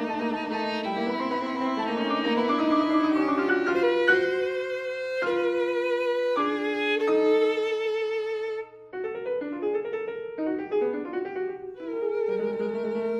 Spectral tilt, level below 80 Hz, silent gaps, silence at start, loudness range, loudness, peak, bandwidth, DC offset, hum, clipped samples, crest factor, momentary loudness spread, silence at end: -5.5 dB/octave; -68 dBFS; none; 0 s; 6 LU; -27 LUFS; -8 dBFS; 9.8 kHz; under 0.1%; none; under 0.1%; 18 dB; 10 LU; 0 s